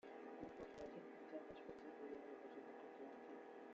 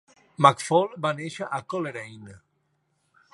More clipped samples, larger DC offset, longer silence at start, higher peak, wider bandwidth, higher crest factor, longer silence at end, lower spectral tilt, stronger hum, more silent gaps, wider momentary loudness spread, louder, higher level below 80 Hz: neither; neither; second, 0.05 s vs 0.4 s; second, -40 dBFS vs -2 dBFS; second, 7.6 kHz vs 11.5 kHz; second, 16 dB vs 26 dB; second, 0 s vs 0.95 s; about the same, -4.5 dB/octave vs -5 dB/octave; neither; neither; second, 3 LU vs 14 LU; second, -56 LUFS vs -24 LUFS; second, -82 dBFS vs -70 dBFS